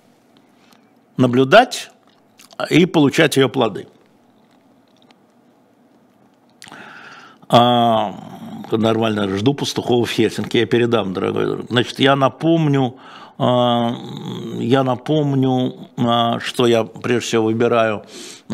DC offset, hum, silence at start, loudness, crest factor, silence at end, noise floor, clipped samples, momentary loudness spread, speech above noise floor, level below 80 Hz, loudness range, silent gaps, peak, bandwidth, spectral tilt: under 0.1%; none; 1.2 s; -17 LUFS; 18 dB; 0 s; -54 dBFS; under 0.1%; 19 LU; 37 dB; -60 dBFS; 4 LU; none; 0 dBFS; 16 kHz; -5.5 dB/octave